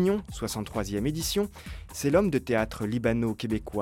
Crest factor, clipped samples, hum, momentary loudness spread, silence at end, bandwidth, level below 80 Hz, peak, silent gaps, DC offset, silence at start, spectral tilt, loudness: 18 dB; under 0.1%; none; 9 LU; 0 s; 17 kHz; -44 dBFS; -10 dBFS; none; under 0.1%; 0 s; -5.5 dB/octave; -28 LUFS